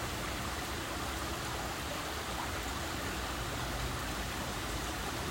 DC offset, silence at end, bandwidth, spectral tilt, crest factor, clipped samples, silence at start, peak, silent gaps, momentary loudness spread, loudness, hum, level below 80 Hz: under 0.1%; 0 s; 16.5 kHz; -3.5 dB/octave; 14 dB; under 0.1%; 0 s; -24 dBFS; none; 1 LU; -37 LUFS; none; -46 dBFS